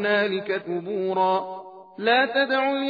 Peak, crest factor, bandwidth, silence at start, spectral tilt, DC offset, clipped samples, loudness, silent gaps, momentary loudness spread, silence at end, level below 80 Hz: -8 dBFS; 16 dB; 5 kHz; 0 s; -7 dB/octave; under 0.1%; under 0.1%; -23 LUFS; none; 13 LU; 0 s; -78 dBFS